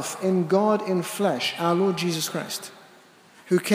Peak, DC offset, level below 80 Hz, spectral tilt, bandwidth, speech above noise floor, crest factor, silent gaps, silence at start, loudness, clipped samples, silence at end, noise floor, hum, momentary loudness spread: -8 dBFS; under 0.1%; -80 dBFS; -5 dB/octave; 16 kHz; 29 dB; 18 dB; none; 0 s; -24 LUFS; under 0.1%; 0 s; -53 dBFS; none; 10 LU